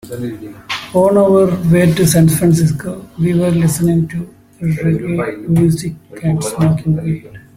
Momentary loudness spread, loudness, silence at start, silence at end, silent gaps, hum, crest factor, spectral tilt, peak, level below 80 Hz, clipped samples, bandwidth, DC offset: 14 LU; -14 LUFS; 0.05 s; 0.15 s; none; none; 14 dB; -6.5 dB/octave; 0 dBFS; -42 dBFS; under 0.1%; 16 kHz; under 0.1%